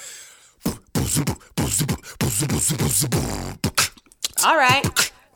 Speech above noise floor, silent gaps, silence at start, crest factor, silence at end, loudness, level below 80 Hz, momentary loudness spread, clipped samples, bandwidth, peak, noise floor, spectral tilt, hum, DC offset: 25 dB; none; 0 s; 20 dB; 0.25 s; -21 LUFS; -40 dBFS; 13 LU; under 0.1%; over 20 kHz; -2 dBFS; -46 dBFS; -3 dB/octave; none; under 0.1%